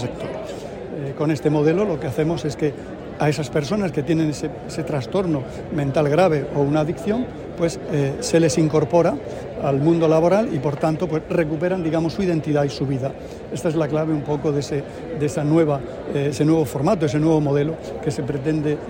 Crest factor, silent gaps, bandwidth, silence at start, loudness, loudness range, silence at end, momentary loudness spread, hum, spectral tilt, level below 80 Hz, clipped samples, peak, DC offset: 16 dB; none; 16.5 kHz; 0 s; -21 LUFS; 4 LU; 0 s; 11 LU; none; -7 dB/octave; -46 dBFS; under 0.1%; -4 dBFS; under 0.1%